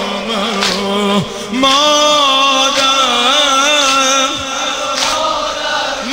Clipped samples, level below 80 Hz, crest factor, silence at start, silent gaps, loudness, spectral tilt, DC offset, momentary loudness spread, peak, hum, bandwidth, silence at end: under 0.1%; -44 dBFS; 12 dB; 0 s; none; -11 LUFS; -1.5 dB/octave; under 0.1%; 8 LU; 0 dBFS; none; 16.5 kHz; 0 s